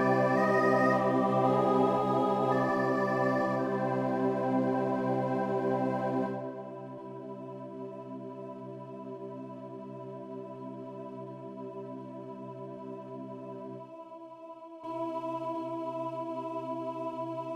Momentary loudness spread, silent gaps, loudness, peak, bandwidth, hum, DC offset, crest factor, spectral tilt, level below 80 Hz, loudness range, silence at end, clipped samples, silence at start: 17 LU; none; -30 LUFS; -14 dBFS; 11.5 kHz; none; under 0.1%; 18 dB; -8 dB/octave; -74 dBFS; 15 LU; 0 s; under 0.1%; 0 s